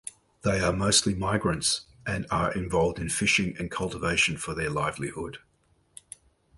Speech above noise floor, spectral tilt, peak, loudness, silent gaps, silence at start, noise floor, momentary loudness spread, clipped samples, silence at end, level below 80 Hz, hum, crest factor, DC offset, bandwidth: 40 dB; -3.5 dB/octave; -8 dBFS; -26 LUFS; none; 0.05 s; -67 dBFS; 14 LU; under 0.1%; 1.2 s; -46 dBFS; none; 20 dB; under 0.1%; 12 kHz